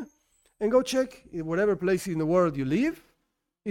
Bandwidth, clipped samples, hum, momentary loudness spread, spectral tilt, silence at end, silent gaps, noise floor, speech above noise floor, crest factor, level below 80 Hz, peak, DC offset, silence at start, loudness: 16.5 kHz; under 0.1%; none; 13 LU; -6 dB/octave; 0 s; none; -78 dBFS; 53 dB; 16 dB; -56 dBFS; -12 dBFS; under 0.1%; 0 s; -27 LUFS